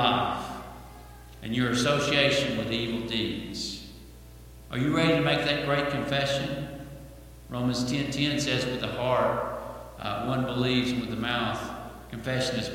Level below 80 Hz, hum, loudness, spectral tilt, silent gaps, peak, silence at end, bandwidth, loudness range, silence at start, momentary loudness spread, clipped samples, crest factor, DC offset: -50 dBFS; none; -27 LUFS; -5 dB/octave; none; -8 dBFS; 0 s; 17 kHz; 2 LU; 0 s; 18 LU; under 0.1%; 20 dB; under 0.1%